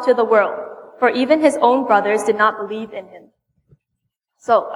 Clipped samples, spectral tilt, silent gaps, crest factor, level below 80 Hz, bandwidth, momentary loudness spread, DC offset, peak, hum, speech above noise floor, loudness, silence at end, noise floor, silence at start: under 0.1%; -4 dB/octave; none; 16 dB; -66 dBFS; 12 kHz; 17 LU; under 0.1%; -2 dBFS; none; 60 dB; -16 LUFS; 0 s; -76 dBFS; 0 s